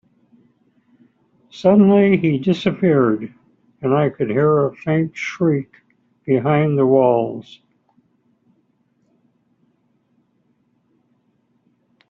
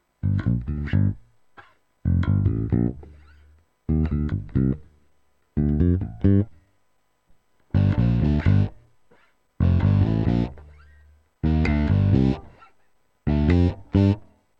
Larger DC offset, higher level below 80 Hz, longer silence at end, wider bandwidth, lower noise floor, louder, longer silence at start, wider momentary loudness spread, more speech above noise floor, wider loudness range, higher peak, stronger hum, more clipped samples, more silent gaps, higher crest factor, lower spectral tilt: neither; second, -60 dBFS vs -32 dBFS; first, 4.7 s vs 0.35 s; first, 7.2 kHz vs 5.6 kHz; second, -64 dBFS vs -70 dBFS; first, -17 LUFS vs -23 LUFS; first, 1.55 s vs 0.25 s; first, 13 LU vs 9 LU; about the same, 48 dB vs 48 dB; about the same, 4 LU vs 4 LU; first, -2 dBFS vs -6 dBFS; neither; neither; neither; about the same, 16 dB vs 16 dB; second, -7 dB/octave vs -10 dB/octave